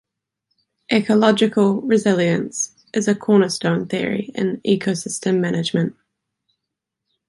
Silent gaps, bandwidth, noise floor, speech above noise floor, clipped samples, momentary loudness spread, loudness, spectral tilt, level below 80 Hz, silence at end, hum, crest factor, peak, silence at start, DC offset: none; 11.5 kHz; -82 dBFS; 63 dB; under 0.1%; 8 LU; -19 LUFS; -5 dB/octave; -64 dBFS; 1.35 s; none; 18 dB; -2 dBFS; 0.9 s; under 0.1%